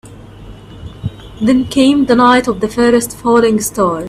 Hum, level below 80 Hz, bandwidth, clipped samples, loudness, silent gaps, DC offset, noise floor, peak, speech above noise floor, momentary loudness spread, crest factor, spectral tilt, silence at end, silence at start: none; -38 dBFS; 15.5 kHz; under 0.1%; -12 LUFS; none; under 0.1%; -34 dBFS; 0 dBFS; 22 dB; 17 LU; 14 dB; -4.5 dB/octave; 0 s; 0.05 s